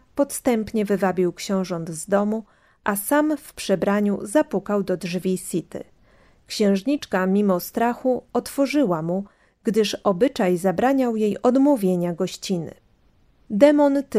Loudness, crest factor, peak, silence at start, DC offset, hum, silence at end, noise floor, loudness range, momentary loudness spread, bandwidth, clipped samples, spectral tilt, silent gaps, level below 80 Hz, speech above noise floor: -22 LUFS; 20 dB; -2 dBFS; 0.15 s; under 0.1%; none; 0 s; -58 dBFS; 3 LU; 10 LU; 16 kHz; under 0.1%; -5.5 dB/octave; none; -58 dBFS; 37 dB